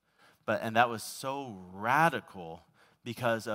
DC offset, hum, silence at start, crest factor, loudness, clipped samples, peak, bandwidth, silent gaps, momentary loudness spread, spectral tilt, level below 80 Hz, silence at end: under 0.1%; none; 0.45 s; 24 dB; -31 LUFS; under 0.1%; -8 dBFS; 16 kHz; none; 19 LU; -4.5 dB/octave; -76 dBFS; 0 s